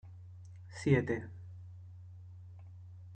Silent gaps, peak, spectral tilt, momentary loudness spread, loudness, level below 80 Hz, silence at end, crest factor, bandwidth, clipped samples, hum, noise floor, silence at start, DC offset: none; -14 dBFS; -7.5 dB/octave; 22 LU; -33 LUFS; -68 dBFS; 0 s; 24 dB; 9 kHz; under 0.1%; none; -51 dBFS; 0.05 s; under 0.1%